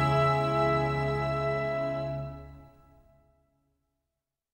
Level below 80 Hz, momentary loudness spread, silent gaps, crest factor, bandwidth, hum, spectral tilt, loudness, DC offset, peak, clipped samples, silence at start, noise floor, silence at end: -50 dBFS; 12 LU; none; 16 dB; 9.8 kHz; none; -7.5 dB/octave; -28 LUFS; under 0.1%; -16 dBFS; under 0.1%; 0 s; -86 dBFS; 1.9 s